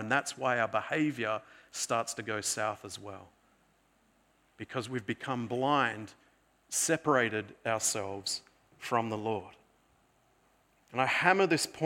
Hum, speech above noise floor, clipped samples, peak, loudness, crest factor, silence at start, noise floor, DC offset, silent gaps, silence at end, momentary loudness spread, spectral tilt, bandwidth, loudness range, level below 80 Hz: none; 37 dB; under 0.1%; -8 dBFS; -31 LUFS; 26 dB; 0 s; -69 dBFS; under 0.1%; none; 0 s; 15 LU; -3 dB/octave; 17.5 kHz; 6 LU; -76 dBFS